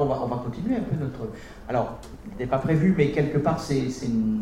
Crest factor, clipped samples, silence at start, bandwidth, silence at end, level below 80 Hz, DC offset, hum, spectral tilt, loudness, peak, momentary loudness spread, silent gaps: 16 dB; under 0.1%; 0 s; 13 kHz; 0 s; -44 dBFS; under 0.1%; none; -7.5 dB/octave; -25 LUFS; -8 dBFS; 14 LU; none